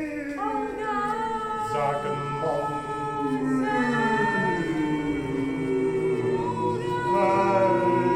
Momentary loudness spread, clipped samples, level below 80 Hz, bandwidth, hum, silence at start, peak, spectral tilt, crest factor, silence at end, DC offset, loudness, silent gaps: 7 LU; under 0.1%; -52 dBFS; 14.5 kHz; none; 0 s; -10 dBFS; -6.5 dB/octave; 14 dB; 0 s; under 0.1%; -25 LUFS; none